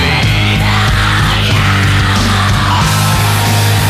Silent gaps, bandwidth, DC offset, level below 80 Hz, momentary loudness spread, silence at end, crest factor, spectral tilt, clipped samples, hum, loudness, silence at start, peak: none; 16 kHz; under 0.1%; -22 dBFS; 1 LU; 0 s; 8 dB; -4.5 dB/octave; under 0.1%; none; -10 LUFS; 0 s; -2 dBFS